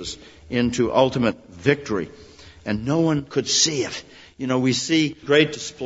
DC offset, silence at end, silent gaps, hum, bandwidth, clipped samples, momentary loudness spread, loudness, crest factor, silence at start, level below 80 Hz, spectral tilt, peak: under 0.1%; 0 s; none; none; 8 kHz; under 0.1%; 14 LU; -21 LUFS; 20 dB; 0 s; -50 dBFS; -4 dB/octave; -2 dBFS